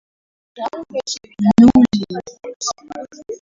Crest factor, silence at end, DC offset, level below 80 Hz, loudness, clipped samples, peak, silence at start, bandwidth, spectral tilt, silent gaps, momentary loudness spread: 16 dB; 0.05 s; under 0.1%; -46 dBFS; -16 LUFS; under 0.1%; 0 dBFS; 0.55 s; 7.8 kHz; -5.5 dB/octave; 2.56-2.60 s; 22 LU